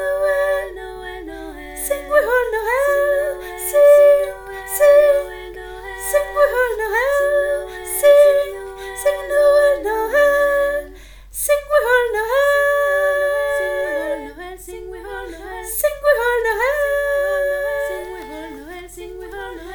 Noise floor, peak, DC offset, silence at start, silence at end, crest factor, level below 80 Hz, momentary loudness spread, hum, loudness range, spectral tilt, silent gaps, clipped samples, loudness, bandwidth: -39 dBFS; -2 dBFS; under 0.1%; 0 s; 0 s; 16 dB; -42 dBFS; 19 LU; none; 6 LU; -2.5 dB/octave; none; under 0.1%; -17 LUFS; 19 kHz